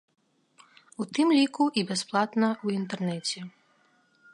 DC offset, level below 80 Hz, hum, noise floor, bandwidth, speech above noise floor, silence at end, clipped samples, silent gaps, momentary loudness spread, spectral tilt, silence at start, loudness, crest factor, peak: under 0.1%; -78 dBFS; none; -66 dBFS; 11.5 kHz; 39 dB; 0.85 s; under 0.1%; none; 15 LU; -4.5 dB/octave; 1 s; -27 LUFS; 18 dB; -10 dBFS